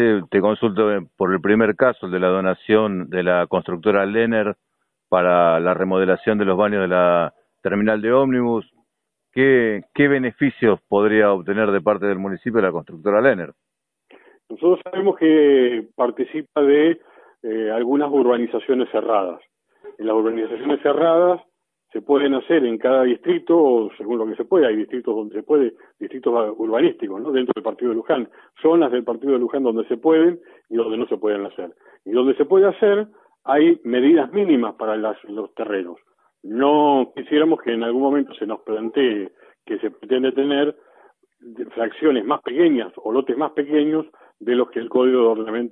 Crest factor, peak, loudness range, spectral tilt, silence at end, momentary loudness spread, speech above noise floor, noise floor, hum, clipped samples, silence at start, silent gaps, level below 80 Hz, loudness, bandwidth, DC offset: 18 dB; -2 dBFS; 3 LU; -10 dB/octave; 0 s; 11 LU; 58 dB; -77 dBFS; none; under 0.1%; 0 s; none; -64 dBFS; -19 LUFS; 4 kHz; under 0.1%